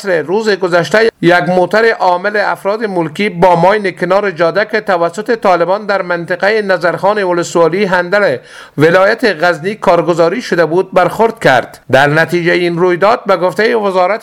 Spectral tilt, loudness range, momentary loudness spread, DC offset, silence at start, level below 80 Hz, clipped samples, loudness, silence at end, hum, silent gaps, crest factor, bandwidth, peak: -5.5 dB/octave; 2 LU; 5 LU; under 0.1%; 0 s; -48 dBFS; 0.3%; -11 LUFS; 0 s; none; none; 12 dB; 15.5 kHz; 0 dBFS